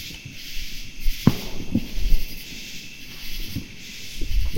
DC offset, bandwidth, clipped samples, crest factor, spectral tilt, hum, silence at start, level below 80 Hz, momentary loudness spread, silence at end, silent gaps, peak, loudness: under 0.1%; 16.5 kHz; under 0.1%; 22 dB; -5 dB/octave; none; 0 s; -28 dBFS; 13 LU; 0 s; none; 0 dBFS; -30 LUFS